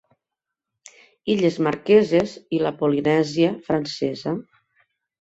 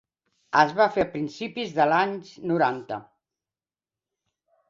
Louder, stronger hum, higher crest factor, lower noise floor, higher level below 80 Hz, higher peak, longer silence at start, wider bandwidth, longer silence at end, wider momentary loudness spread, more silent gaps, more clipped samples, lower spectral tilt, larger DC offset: first, -21 LUFS vs -24 LUFS; neither; about the same, 18 dB vs 22 dB; second, -85 dBFS vs under -90 dBFS; about the same, -60 dBFS vs -64 dBFS; about the same, -4 dBFS vs -4 dBFS; first, 1.25 s vs 0.5 s; about the same, 8 kHz vs 7.6 kHz; second, 0.8 s vs 1.65 s; about the same, 11 LU vs 13 LU; neither; neither; about the same, -6.5 dB/octave vs -5.5 dB/octave; neither